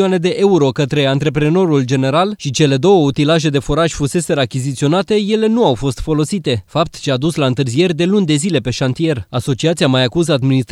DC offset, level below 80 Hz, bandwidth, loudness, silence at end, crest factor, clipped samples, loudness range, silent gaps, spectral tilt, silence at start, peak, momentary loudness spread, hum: under 0.1%; -38 dBFS; 12.5 kHz; -15 LUFS; 0.1 s; 14 dB; under 0.1%; 2 LU; none; -6 dB/octave; 0 s; 0 dBFS; 5 LU; none